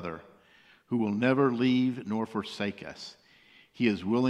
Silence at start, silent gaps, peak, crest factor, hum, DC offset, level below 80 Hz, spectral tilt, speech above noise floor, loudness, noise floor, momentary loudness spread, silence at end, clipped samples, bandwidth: 0 s; none; -10 dBFS; 20 dB; none; under 0.1%; -68 dBFS; -7 dB/octave; 32 dB; -29 LUFS; -60 dBFS; 17 LU; 0 s; under 0.1%; 9.8 kHz